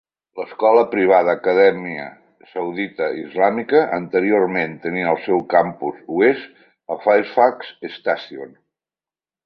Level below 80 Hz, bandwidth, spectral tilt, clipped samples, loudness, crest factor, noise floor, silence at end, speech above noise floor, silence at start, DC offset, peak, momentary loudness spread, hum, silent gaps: -64 dBFS; 5.6 kHz; -8.5 dB/octave; under 0.1%; -18 LUFS; 18 dB; under -90 dBFS; 1 s; over 72 dB; 0.35 s; under 0.1%; -2 dBFS; 17 LU; none; none